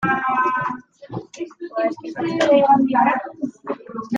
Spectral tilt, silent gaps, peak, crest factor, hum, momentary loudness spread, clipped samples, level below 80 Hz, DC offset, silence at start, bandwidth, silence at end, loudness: -6 dB/octave; none; -4 dBFS; 16 dB; none; 19 LU; under 0.1%; -62 dBFS; under 0.1%; 0 s; 9.2 kHz; 0 s; -20 LUFS